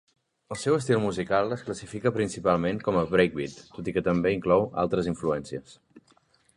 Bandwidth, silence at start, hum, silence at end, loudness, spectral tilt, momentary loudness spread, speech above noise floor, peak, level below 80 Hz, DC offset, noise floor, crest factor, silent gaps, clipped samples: 11.5 kHz; 0.5 s; none; 0.55 s; -27 LUFS; -6 dB/octave; 12 LU; 38 dB; -6 dBFS; -54 dBFS; under 0.1%; -64 dBFS; 20 dB; none; under 0.1%